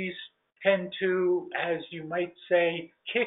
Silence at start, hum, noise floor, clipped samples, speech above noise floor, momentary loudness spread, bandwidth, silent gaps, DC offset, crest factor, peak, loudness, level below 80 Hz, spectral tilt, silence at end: 0 s; none; -48 dBFS; under 0.1%; 20 dB; 11 LU; 4 kHz; none; under 0.1%; 18 dB; -12 dBFS; -29 LUFS; -76 dBFS; -3 dB/octave; 0 s